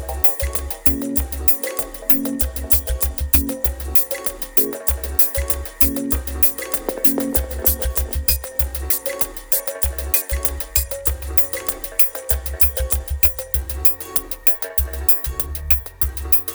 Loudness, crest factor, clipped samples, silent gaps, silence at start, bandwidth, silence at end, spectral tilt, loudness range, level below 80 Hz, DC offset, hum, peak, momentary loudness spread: -17 LUFS; 18 dB; under 0.1%; none; 0 s; over 20 kHz; 0 s; -4 dB/octave; 2 LU; -28 dBFS; under 0.1%; none; -2 dBFS; 7 LU